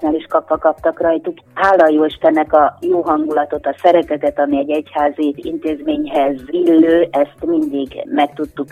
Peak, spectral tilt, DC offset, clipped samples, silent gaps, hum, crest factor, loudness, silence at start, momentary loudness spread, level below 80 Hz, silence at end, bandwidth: 0 dBFS; -6.5 dB/octave; under 0.1%; under 0.1%; none; none; 14 dB; -15 LUFS; 0 s; 9 LU; -48 dBFS; 0.05 s; 9 kHz